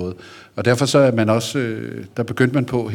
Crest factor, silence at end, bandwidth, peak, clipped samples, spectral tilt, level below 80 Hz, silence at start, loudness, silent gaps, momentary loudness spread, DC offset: 16 dB; 0 s; 17.5 kHz; -2 dBFS; under 0.1%; -5.5 dB/octave; -58 dBFS; 0 s; -19 LUFS; none; 15 LU; under 0.1%